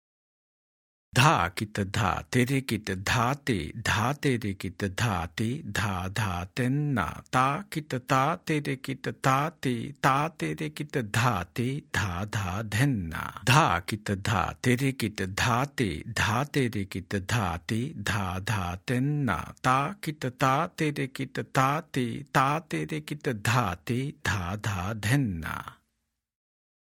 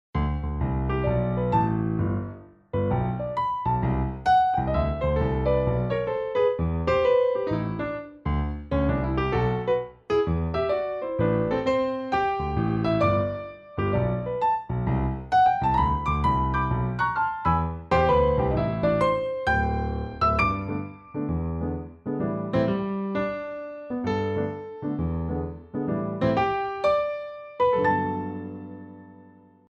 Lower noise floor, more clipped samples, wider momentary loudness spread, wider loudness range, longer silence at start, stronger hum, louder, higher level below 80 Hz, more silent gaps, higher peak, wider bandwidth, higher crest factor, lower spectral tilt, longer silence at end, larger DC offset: first, -80 dBFS vs -52 dBFS; neither; second, 7 LU vs 11 LU; about the same, 3 LU vs 5 LU; first, 1.15 s vs 0.15 s; neither; second, -28 LUFS vs -25 LUFS; second, -54 dBFS vs -36 dBFS; neither; first, -4 dBFS vs -12 dBFS; first, 17 kHz vs 8 kHz; first, 24 dB vs 14 dB; second, -5 dB/octave vs -8.5 dB/octave; first, 1.2 s vs 0.5 s; neither